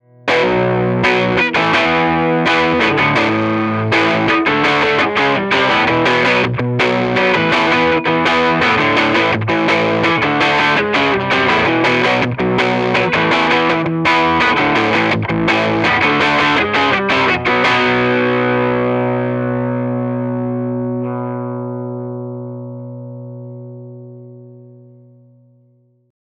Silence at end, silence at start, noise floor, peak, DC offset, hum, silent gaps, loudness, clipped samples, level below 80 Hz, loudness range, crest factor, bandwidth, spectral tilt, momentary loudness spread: 1.7 s; 0.25 s; -54 dBFS; 0 dBFS; under 0.1%; 60 Hz at -50 dBFS; none; -14 LUFS; under 0.1%; -46 dBFS; 10 LU; 14 dB; 9.4 kHz; -5.5 dB/octave; 11 LU